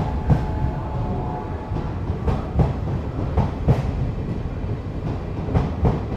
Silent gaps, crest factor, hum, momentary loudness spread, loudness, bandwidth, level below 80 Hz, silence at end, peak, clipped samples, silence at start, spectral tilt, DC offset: none; 18 dB; none; 7 LU; -24 LUFS; 7.8 kHz; -28 dBFS; 0 s; -4 dBFS; under 0.1%; 0 s; -9.5 dB/octave; under 0.1%